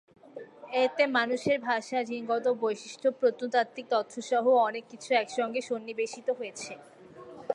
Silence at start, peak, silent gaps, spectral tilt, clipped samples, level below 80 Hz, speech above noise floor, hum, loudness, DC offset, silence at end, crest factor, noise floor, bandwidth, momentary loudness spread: 0.35 s; -10 dBFS; none; -3.5 dB/octave; under 0.1%; -78 dBFS; 19 dB; none; -29 LUFS; under 0.1%; 0 s; 20 dB; -48 dBFS; 11 kHz; 17 LU